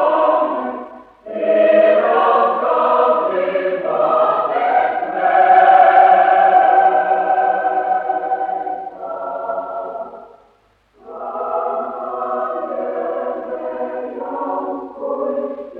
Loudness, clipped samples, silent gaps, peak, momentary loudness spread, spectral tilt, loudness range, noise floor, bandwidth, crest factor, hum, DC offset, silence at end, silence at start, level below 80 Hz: -16 LUFS; under 0.1%; none; 0 dBFS; 16 LU; -6.5 dB/octave; 13 LU; -56 dBFS; 4.5 kHz; 16 dB; none; under 0.1%; 0 s; 0 s; -64 dBFS